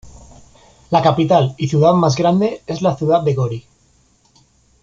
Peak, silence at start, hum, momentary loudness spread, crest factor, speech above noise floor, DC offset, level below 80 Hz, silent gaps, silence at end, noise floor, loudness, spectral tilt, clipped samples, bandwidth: -2 dBFS; 0.05 s; none; 7 LU; 16 dB; 41 dB; under 0.1%; -50 dBFS; none; 1.25 s; -56 dBFS; -16 LUFS; -7 dB/octave; under 0.1%; 7.8 kHz